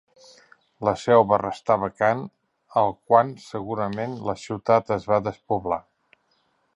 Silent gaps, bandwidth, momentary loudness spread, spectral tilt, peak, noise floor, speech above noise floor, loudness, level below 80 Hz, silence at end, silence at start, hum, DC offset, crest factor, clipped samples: none; 10.5 kHz; 11 LU; -6.5 dB/octave; -2 dBFS; -68 dBFS; 46 dB; -23 LUFS; -58 dBFS; 0.95 s; 0.8 s; none; under 0.1%; 22 dB; under 0.1%